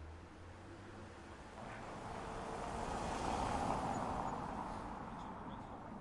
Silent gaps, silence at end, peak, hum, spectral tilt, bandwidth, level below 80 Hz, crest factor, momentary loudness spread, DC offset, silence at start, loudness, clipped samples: none; 0 s; -26 dBFS; none; -5.5 dB/octave; 11.5 kHz; -56 dBFS; 18 dB; 15 LU; under 0.1%; 0 s; -44 LUFS; under 0.1%